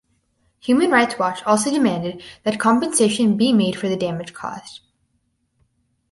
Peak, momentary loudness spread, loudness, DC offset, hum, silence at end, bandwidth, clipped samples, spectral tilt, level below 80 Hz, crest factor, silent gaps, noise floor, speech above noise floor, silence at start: -2 dBFS; 15 LU; -19 LUFS; under 0.1%; none; 1.35 s; 11.5 kHz; under 0.1%; -4.5 dB/octave; -60 dBFS; 18 dB; none; -69 dBFS; 50 dB; 0.65 s